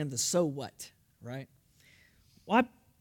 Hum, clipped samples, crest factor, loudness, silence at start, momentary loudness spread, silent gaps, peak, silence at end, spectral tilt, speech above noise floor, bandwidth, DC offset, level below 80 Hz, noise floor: none; under 0.1%; 24 dB; -31 LUFS; 0 s; 20 LU; none; -10 dBFS; 0.35 s; -4 dB/octave; 32 dB; 18 kHz; under 0.1%; -72 dBFS; -63 dBFS